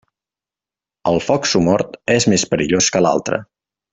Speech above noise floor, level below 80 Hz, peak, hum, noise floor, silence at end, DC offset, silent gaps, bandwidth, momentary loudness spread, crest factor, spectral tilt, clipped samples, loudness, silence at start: 74 dB; -50 dBFS; -2 dBFS; none; -90 dBFS; 0.5 s; under 0.1%; none; 8.4 kHz; 7 LU; 16 dB; -4 dB/octave; under 0.1%; -16 LUFS; 1.05 s